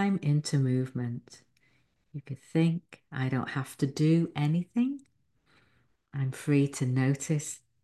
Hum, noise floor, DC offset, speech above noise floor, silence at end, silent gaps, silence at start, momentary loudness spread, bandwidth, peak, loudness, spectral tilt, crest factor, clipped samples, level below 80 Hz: none; -70 dBFS; under 0.1%; 41 dB; 0.25 s; none; 0 s; 15 LU; 12.5 kHz; -14 dBFS; -29 LUFS; -6.5 dB/octave; 16 dB; under 0.1%; -68 dBFS